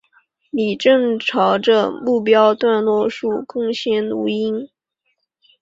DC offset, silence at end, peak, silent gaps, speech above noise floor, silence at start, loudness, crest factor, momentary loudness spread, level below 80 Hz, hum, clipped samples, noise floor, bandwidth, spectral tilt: under 0.1%; 0.95 s; -2 dBFS; none; 54 dB; 0.55 s; -17 LUFS; 16 dB; 9 LU; -64 dBFS; none; under 0.1%; -71 dBFS; 7.6 kHz; -5.5 dB/octave